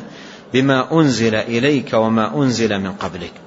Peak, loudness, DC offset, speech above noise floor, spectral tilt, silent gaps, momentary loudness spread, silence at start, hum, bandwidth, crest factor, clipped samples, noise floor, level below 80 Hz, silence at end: -2 dBFS; -17 LUFS; under 0.1%; 20 dB; -5.5 dB/octave; none; 12 LU; 0 s; none; 8 kHz; 16 dB; under 0.1%; -36 dBFS; -52 dBFS; 0 s